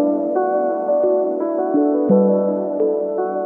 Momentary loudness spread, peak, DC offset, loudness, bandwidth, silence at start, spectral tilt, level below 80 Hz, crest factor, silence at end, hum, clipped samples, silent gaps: 6 LU; -4 dBFS; under 0.1%; -18 LUFS; 2.4 kHz; 0 s; -13 dB/octave; -70 dBFS; 14 dB; 0 s; none; under 0.1%; none